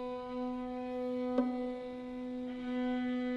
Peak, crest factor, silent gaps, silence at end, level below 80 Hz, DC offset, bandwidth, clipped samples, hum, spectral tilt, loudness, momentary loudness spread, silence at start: -20 dBFS; 18 dB; none; 0 s; -62 dBFS; under 0.1%; 5.8 kHz; under 0.1%; none; -6.5 dB/octave; -38 LUFS; 8 LU; 0 s